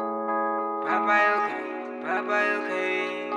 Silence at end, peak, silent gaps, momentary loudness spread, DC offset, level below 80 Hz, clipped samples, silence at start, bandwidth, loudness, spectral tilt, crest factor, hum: 0 s; -10 dBFS; none; 9 LU; under 0.1%; -86 dBFS; under 0.1%; 0 s; 10.5 kHz; -25 LUFS; -4.5 dB/octave; 16 dB; none